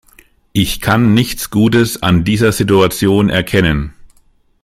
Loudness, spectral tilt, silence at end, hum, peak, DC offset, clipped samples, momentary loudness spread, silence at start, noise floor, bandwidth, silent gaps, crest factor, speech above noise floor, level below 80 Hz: -13 LUFS; -5.5 dB/octave; 0.7 s; none; 0 dBFS; under 0.1%; under 0.1%; 5 LU; 0.55 s; -52 dBFS; 16 kHz; none; 14 dB; 40 dB; -32 dBFS